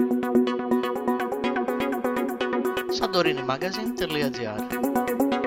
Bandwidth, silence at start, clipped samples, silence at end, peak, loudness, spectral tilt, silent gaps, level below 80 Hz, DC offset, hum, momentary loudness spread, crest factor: 16.5 kHz; 0 s; under 0.1%; 0 s; -8 dBFS; -26 LUFS; -5 dB/octave; none; -56 dBFS; under 0.1%; none; 5 LU; 16 dB